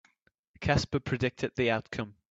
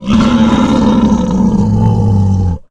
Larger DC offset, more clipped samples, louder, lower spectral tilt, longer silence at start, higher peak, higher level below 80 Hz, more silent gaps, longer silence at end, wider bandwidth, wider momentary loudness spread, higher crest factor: neither; neither; second, -31 LUFS vs -11 LUFS; second, -6 dB/octave vs -7.5 dB/octave; first, 0.6 s vs 0 s; second, -10 dBFS vs 0 dBFS; second, -52 dBFS vs -24 dBFS; neither; about the same, 0.2 s vs 0.1 s; second, 8 kHz vs 9 kHz; first, 9 LU vs 2 LU; first, 22 dB vs 10 dB